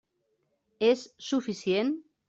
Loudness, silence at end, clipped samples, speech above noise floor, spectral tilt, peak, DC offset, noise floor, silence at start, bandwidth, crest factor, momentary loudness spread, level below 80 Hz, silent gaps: -29 LUFS; 0.25 s; under 0.1%; 48 dB; -5 dB/octave; -12 dBFS; under 0.1%; -76 dBFS; 0.8 s; 8 kHz; 18 dB; 5 LU; -74 dBFS; none